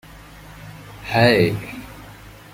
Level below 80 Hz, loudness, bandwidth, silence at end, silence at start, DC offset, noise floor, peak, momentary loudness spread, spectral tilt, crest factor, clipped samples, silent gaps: -46 dBFS; -18 LUFS; 16.5 kHz; 0.25 s; 0.15 s; under 0.1%; -41 dBFS; 0 dBFS; 26 LU; -6 dB/octave; 22 dB; under 0.1%; none